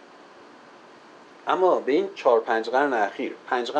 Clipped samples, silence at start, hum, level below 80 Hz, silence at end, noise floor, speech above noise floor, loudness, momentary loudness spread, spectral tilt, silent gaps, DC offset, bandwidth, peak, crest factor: under 0.1%; 1.45 s; none; -82 dBFS; 0 s; -49 dBFS; 26 dB; -23 LUFS; 7 LU; -4.5 dB/octave; none; under 0.1%; 8.6 kHz; -6 dBFS; 18 dB